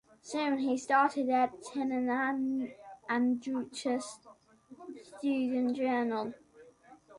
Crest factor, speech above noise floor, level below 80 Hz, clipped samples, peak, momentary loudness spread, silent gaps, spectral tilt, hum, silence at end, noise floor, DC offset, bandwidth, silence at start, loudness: 18 dB; 26 dB; -76 dBFS; under 0.1%; -14 dBFS; 17 LU; none; -4 dB/octave; none; 0 s; -58 dBFS; under 0.1%; 11.5 kHz; 0.25 s; -32 LUFS